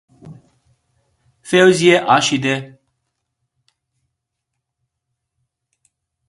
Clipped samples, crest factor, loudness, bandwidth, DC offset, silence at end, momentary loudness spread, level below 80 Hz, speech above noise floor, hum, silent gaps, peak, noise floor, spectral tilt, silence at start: under 0.1%; 20 dB; -14 LUFS; 11.5 kHz; under 0.1%; 3.6 s; 9 LU; -62 dBFS; 64 dB; none; none; 0 dBFS; -78 dBFS; -4 dB/octave; 0.25 s